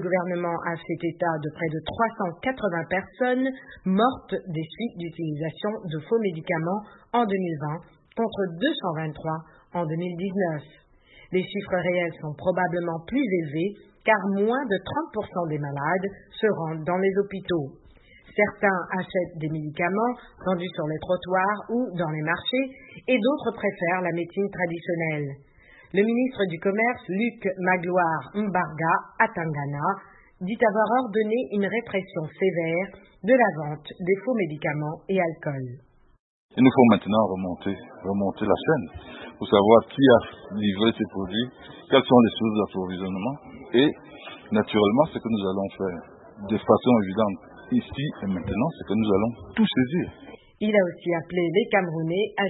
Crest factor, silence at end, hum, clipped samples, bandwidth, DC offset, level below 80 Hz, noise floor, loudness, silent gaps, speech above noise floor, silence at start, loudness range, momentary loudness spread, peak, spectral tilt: 24 dB; 0 s; none; under 0.1%; 4.1 kHz; under 0.1%; -58 dBFS; -53 dBFS; -25 LUFS; 36.19-36.49 s; 28 dB; 0 s; 6 LU; 11 LU; -2 dBFS; -11 dB/octave